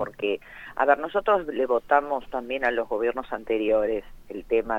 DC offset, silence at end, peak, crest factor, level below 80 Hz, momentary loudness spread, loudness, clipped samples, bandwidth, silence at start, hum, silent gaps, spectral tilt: under 0.1%; 0 s; -6 dBFS; 20 dB; -50 dBFS; 10 LU; -25 LUFS; under 0.1%; 15.5 kHz; 0 s; none; none; -6 dB/octave